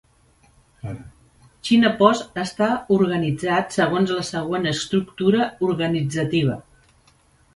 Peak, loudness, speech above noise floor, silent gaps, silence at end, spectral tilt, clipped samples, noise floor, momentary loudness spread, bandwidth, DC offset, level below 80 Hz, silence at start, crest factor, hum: 0 dBFS; -21 LUFS; 37 dB; none; 0.95 s; -5.5 dB/octave; under 0.1%; -57 dBFS; 16 LU; 11.5 kHz; under 0.1%; -54 dBFS; 0.85 s; 22 dB; none